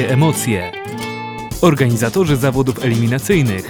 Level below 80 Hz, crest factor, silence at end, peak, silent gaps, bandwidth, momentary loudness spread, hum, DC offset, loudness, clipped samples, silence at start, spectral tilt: -38 dBFS; 14 dB; 0 s; 0 dBFS; none; over 20 kHz; 11 LU; none; 0.2%; -16 LUFS; under 0.1%; 0 s; -6 dB/octave